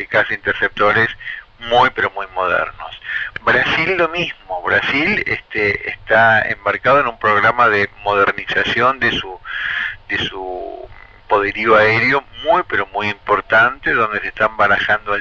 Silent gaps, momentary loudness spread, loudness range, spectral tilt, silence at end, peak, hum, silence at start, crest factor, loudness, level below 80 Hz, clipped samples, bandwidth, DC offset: none; 11 LU; 3 LU; -5.5 dB/octave; 0 s; 0 dBFS; none; 0 s; 16 dB; -16 LUFS; -44 dBFS; under 0.1%; 7.6 kHz; under 0.1%